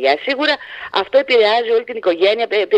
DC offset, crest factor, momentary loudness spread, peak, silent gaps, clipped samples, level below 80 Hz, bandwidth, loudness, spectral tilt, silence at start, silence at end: under 0.1%; 14 dB; 7 LU; 0 dBFS; none; under 0.1%; -64 dBFS; 8.8 kHz; -16 LUFS; -3.5 dB/octave; 0 s; 0 s